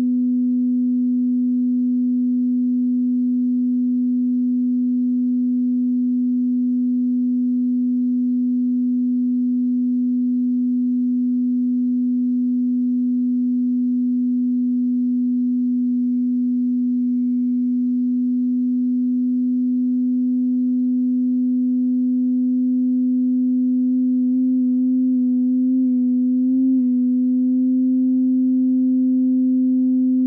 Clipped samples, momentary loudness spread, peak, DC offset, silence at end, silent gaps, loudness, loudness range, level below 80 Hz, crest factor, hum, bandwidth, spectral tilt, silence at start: under 0.1%; 2 LU; -12 dBFS; under 0.1%; 0 s; none; -19 LUFS; 2 LU; -74 dBFS; 6 dB; 60 Hz at -65 dBFS; 0.5 kHz; -11.5 dB/octave; 0 s